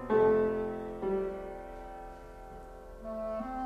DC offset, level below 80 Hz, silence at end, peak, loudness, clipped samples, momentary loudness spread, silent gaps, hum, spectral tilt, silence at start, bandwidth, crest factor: under 0.1%; -52 dBFS; 0 s; -16 dBFS; -32 LUFS; under 0.1%; 22 LU; none; none; -8 dB/octave; 0 s; 6 kHz; 18 dB